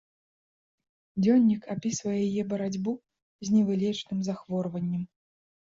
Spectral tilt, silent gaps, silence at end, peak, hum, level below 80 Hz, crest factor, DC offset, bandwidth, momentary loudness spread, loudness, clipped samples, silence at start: -6.5 dB/octave; 3.22-3.39 s; 0.6 s; -12 dBFS; none; -66 dBFS; 16 dB; under 0.1%; 7.8 kHz; 12 LU; -28 LUFS; under 0.1%; 1.15 s